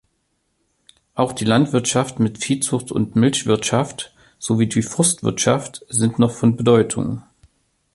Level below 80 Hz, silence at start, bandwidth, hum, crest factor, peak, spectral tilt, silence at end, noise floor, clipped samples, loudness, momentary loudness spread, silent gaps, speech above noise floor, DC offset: -52 dBFS; 1.15 s; 11.5 kHz; none; 18 dB; -2 dBFS; -5 dB/octave; 0.75 s; -69 dBFS; under 0.1%; -19 LUFS; 10 LU; none; 51 dB; under 0.1%